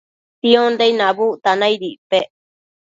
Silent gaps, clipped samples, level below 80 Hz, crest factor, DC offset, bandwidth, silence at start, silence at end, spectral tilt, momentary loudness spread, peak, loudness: 1.98-2.10 s; under 0.1%; -68 dBFS; 18 dB; under 0.1%; 7.8 kHz; 0.45 s; 0.65 s; -4.5 dB/octave; 8 LU; 0 dBFS; -16 LUFS